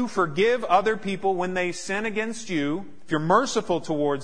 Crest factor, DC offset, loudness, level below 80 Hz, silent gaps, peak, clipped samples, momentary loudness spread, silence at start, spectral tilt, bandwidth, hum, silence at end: 20 dB; 1%; -25 LUFS; -56 dBFS; none; -6 dBFS; under 0.1%; 7 LU; 0 s; -5 dB/octave; 10.5 kHz; none; 0 s